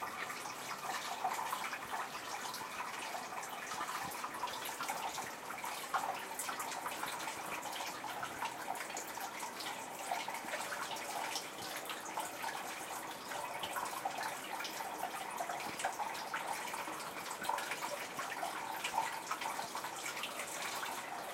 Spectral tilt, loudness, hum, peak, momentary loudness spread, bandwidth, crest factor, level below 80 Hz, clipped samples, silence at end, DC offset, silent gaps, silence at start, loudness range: -1 dB/octave; -41 LUFS; none; -22 dBFS; 4 LU; 16.5 kHz; 20 dB; -80 dBFS; under 0.1%; 0 s; under 0.1%; none; 0 s; 1 LU